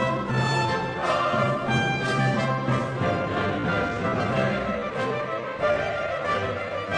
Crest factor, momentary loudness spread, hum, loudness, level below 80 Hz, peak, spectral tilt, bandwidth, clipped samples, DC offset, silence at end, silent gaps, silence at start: 14 dB; 4 LU; none; -25 LUFS; -50 dBFS; -10 dBFS; -6 dB/octave; 10.5 kHz; under 0.1%; under 0.1%; 0 s; none; 0 s